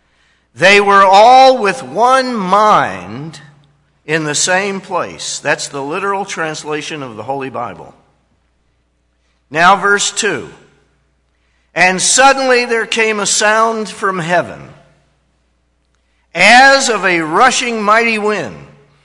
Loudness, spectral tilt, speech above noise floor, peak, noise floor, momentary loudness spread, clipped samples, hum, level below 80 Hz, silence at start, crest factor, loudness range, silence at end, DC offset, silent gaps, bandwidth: -11 LUFS; -2 dB/octave; 48 dB; 0 dBFS; -60 dBFS; 17 LU; 0.3%; none; -54 dBFS; 0.55 s; 14 dB; 10 LU; 0.45 s; under 0.1%; none; 12 kHz